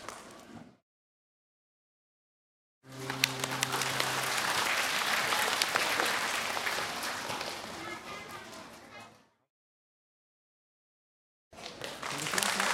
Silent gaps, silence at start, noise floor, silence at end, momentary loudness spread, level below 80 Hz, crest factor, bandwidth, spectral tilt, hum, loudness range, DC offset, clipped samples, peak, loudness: 0.82-2.81 s, 9.50-11.51 s; 0 s; -56 dBFS; 0 s; 20 LU; -70 dBFS; 32 dB; 16.5 kHz; -1 dB/octave; none; 19 LU; under 0.1%; under 0.1%; -4 dBFS; -31 LUFS